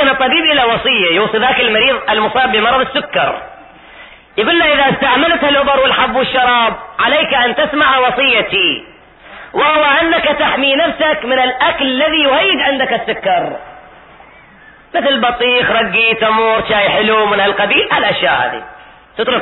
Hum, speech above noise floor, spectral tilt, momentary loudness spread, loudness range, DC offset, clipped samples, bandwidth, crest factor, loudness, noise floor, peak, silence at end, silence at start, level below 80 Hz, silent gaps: none; 29 dB; -8.5 dB/octave; 6 LU; 3 LU; under 0.1%; under 0.1%; 4.2 kHz; 12 dB; -11 LUFS; -41 dBFS; 0 dBFS; 0 s; 0 s; -44 dBFS; none